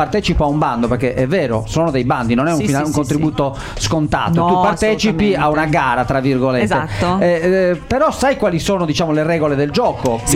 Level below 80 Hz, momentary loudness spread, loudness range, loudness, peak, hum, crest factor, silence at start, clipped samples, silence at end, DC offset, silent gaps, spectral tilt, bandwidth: -32 dBFS; 3 LU; 2 LU; -16 LUFS; -2 dBFS; none; 14 dB; 0 s; under 0.1%; 0 s; under 0.1%; none; -5.5 dB/octave; 15.5 kHz